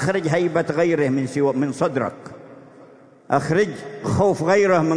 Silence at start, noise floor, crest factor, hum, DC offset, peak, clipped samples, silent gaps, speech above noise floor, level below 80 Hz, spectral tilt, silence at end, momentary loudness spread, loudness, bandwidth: 0 s; -47 dBFS; 18 dB; none; under 0.1%; -4 dBFS; under 0.1%; none; 28 dB; -56 dBFS; -6.5 dB/octave; 0 s; 9 LU; -20 LUFS; 10.5 kHz